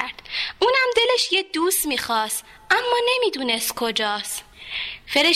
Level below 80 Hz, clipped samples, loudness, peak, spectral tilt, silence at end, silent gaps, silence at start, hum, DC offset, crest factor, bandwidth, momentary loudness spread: -56 dBFS; under 0.1%; -21 LUFS; -4 dBFS; -0.5 dB/octave; 0 s; none; 0 s; none; under 0.1%; 18 dB; 16 kHz; 11 LU